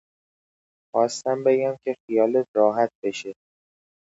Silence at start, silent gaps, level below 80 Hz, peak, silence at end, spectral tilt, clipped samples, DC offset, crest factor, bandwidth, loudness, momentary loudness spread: 0.95 s; 2.00-2.08 s, 2.48-2.54 s, 2.95-3.02 s; -76 dBFS; -6 dBFS; 0.85 s; -5 dB/octave; under 0.1%; under 0.1%; 20 dB; 8 kHz; -23 LUFS; 10 LU